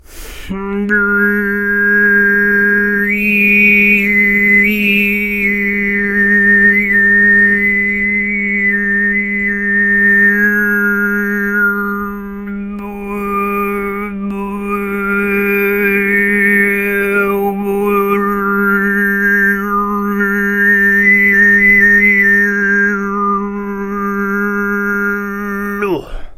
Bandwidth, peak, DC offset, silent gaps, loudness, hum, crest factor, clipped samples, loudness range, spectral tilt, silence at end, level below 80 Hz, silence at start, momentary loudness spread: 15.5 kHz; 0 dBFS; under 0.1%; none; -11 LUFS; none; 12 dB; under 0.1%; 8 LU; -6.5 dB/octave; 0.05 s; -38 dBFS; 0.1 s; 12 LU